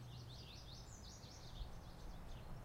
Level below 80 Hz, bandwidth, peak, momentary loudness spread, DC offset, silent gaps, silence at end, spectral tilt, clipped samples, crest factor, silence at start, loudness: -56 dBFS; 16 kHz; -38 dBFS; 2 LU; under 0.1%; none; 0 s; -4.5 dB/octave; under 0.1%; 16 dB; 0 s; -56 LUFS